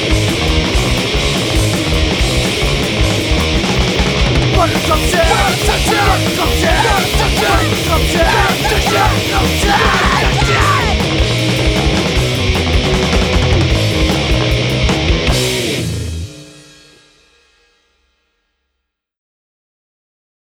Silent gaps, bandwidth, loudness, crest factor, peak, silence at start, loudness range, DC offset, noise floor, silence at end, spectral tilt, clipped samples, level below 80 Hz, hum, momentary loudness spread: none; over 20 kHz; -13 LUFS; 14 dB; 0 dBFS; 0 s; 5 LU; under 0.1%; -73 dBFS; 3.85 s; -4.5 dB/octave; under 0.1%; -20 dBFS; none; 3 LU